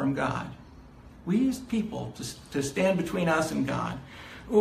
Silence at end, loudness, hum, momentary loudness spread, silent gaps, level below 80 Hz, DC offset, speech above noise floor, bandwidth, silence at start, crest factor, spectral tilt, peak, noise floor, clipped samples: 0 s; -29 LUFS; none; 16 LU; none; -52 dBFS; under 0.1%; 20 dB; 15.5 kHz; 0 s; 18 dB; -6 dB/octave; -10 dBFS; -49 dBFS; under 0.1%